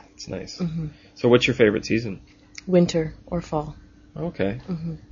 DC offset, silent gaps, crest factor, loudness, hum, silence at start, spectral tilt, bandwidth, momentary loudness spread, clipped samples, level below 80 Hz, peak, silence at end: under 0.1%; none; 22 dB; -23 LUFS; none; 0.2 s; -6 dB/octave; 7.4 kHz; 18 LU; under 0.1%; -48 dBFS; -2 dBFS; 0.15 s